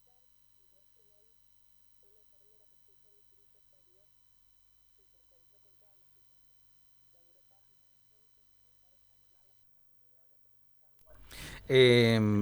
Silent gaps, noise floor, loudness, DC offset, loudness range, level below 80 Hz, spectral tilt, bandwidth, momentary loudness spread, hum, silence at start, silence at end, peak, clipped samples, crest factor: none; -66 dBFS; -25 LUFS; under 0.1%; 29 LU; -64 dBFS; -6 dB/octave; over 20 kHz; 25 LU; 50 Hz at -95 dBFS; 11.35 s; 0 s; -12 dBFS; under 0.1%; 24 dB